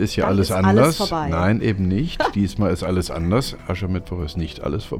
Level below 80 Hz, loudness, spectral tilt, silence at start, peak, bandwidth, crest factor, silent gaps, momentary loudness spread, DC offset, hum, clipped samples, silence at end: -36 dBFS; -20 LUFS; -6.5 dB/octave; 0 s; -2 dBFS; 16 kHz; 18 dB; none; 11 LU; under 0.1%; none; under 0.1%; 0 s